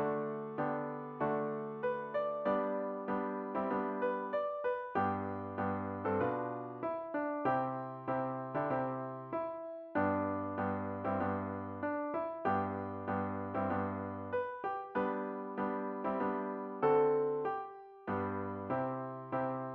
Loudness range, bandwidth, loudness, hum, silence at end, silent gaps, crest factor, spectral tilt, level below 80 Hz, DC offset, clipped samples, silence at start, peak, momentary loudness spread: 2 LU; 5.4 kHz; -37 LUFS; none; 0 s; none; 18 dB; -7 dB/octave; -74 dBFS; under 0.1%; under 0.1%; 0 s; -18 dBFS; 6 LU